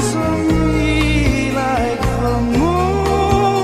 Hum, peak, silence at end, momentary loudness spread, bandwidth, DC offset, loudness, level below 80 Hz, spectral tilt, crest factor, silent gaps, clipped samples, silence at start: none; -2 dBFS; 0 s; 3 LU; 15 kHz; under 0.1%; -16 LUFS; -24 dBFS; -6 dB/octave; 14 dB; none; under 0.1%; 0 s